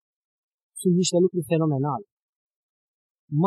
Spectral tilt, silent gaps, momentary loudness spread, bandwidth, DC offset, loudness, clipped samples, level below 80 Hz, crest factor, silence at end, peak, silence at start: -6 dB/octave; 2.12-2.50 s, 2.56-3.28 s; 11 LU; 12.5 kHz; under 0.1%; -24 LUFS; under 0.1%; -72 dBFS; 16 dB; 0 s; -10 dBFS; 0.75 s